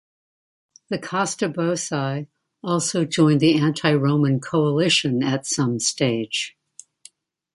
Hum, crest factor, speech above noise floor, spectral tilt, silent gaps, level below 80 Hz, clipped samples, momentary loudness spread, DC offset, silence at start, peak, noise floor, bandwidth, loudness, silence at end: none; 18 dB; 31 dB; -4.5 dB/octave; none; -64 dBFS; under 0.1%; 11 LU; under 0.1%; 0.9 s; -4 dBFS; -52 dBFS; 11.5 kHz; -21 LUFS; 1.05 s